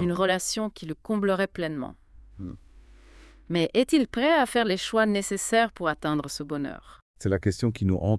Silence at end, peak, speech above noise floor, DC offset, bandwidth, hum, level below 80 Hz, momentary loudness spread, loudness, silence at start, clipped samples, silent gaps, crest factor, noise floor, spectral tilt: 0 s; -10 dBFS; 25 dB; under 0.1%; 12 kHz; none; -52 dBFS; 14 LU; -26 LUFS; 0 s; under 0.1%; 7.02-7.14 s; 18 dB; -51 dBFS; -5 dB/octave